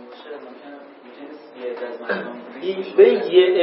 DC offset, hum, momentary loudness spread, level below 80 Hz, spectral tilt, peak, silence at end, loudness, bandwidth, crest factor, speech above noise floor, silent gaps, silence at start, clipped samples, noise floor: under 0.1%; none; 25 LU; -82 dBFS; -9.5 dB/octave; -2 dBFS; 0 s; -19 LUFS; 5.6 kHz; 18 dB; 23 dB; none; 0 s; under 0.1%; -41 dBFS